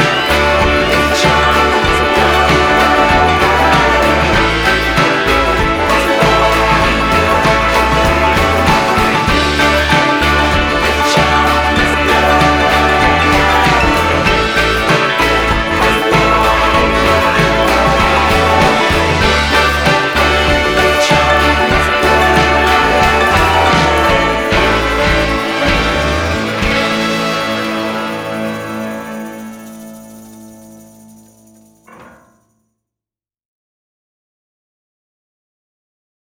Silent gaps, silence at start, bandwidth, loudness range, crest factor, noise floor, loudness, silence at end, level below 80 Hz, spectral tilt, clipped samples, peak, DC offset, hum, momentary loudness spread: none; 0 s; over 20 kHz; 6 LU; 12 dB; -89 dBFS; -11 LUFS; 4.2 s; -24 dBFS; -4.5 dB/octave; under 0.1%; 0 dBFS; under 0.1%; none; 5 LU